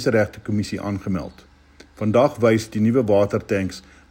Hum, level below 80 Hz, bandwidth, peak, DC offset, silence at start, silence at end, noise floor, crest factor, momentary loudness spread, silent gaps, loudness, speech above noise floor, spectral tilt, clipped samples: none; -50 dBFS; 16.5 kHz; -4 dBFS; under 0.1%; 0 s; 0.3 s; -49 dBFS; 16 dB; 11 LU; none; -21 LUFS; 29 dB; -7 dB/octave; under 0.1%